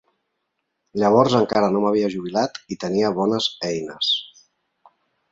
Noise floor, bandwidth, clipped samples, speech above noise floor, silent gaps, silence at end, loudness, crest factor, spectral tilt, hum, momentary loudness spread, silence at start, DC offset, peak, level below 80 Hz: -76 dBFS; 8 kHz; under 0.1%; 56 dB; none; 1.05 s; -21 LUFS; 20 dB; -5.5 dB/octave; none; 10 LU; 0.95 s; under 0.1%; -2 dBFS; -60 dBFS